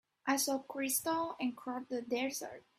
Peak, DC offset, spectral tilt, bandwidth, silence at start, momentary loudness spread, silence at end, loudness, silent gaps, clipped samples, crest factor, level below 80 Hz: -18 dBFS; under 0.1%; -1.5 dB/octave; 16 kHz; 0.25 s; 7 LU; 0.2 s; -36 LUFS; none; under 0.1%; 20 dB; -80 dBFS